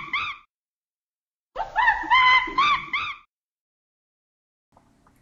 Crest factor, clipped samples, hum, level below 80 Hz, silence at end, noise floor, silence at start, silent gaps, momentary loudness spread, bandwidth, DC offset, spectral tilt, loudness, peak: 18 dB; under 0.1%; none; -54 dBFS; 2.05 s; under -90 dBFS; 0 s; 0.50-1.50 s; 22 LU; 7.4 kHz; under 0.1%; -1.5 dB/octave; -20 LUFS; -8 dBFS